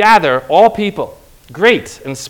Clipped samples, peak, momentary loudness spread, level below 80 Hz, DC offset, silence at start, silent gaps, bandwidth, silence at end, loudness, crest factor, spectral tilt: 1%; 0 dBFS; 15 LU; -46 dBFS; under 0.1%; 0 s; none; over 20 kHz; 0 s; -12 LUFS; 12 dB; -4 dB/octave